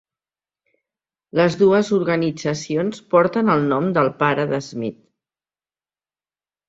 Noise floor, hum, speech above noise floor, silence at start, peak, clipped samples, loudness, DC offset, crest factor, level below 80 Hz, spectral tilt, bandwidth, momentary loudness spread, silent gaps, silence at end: under -90 dBFS; 50 Hz at -45 dBFS; over 72 dB; 1.35 s; -2 dBFS; under 0.1%; -19 LUFS; under 0.1%; 18 dB; -62 dBFS; -6.5 dB/octave; 7.8 kHz; 9 LU; none; 1.75 s